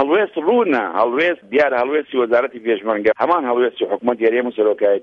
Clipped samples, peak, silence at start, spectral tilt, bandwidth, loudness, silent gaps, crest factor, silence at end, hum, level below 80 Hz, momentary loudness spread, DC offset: under 0.1%; -2 dBFS; 0 s; -6.5 dB/octave; 6 kHz; -17 LUFS; none; 14 dB; 0 s; none; -62 dBFS; 3 LU; under 0.1%